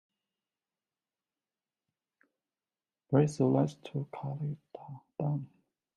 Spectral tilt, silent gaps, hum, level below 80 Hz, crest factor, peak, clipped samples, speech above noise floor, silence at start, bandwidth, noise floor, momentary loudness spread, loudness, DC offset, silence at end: -8.5 dB/octave; none; none; -72 dBFS; 22 dB; -14 dBFS; under 0.1%; over 58 dB; 3.1 s; 10.5 kHz; under -90 dBFS; 19 LU; -32 LUFS; under 0.1%; 0.5 s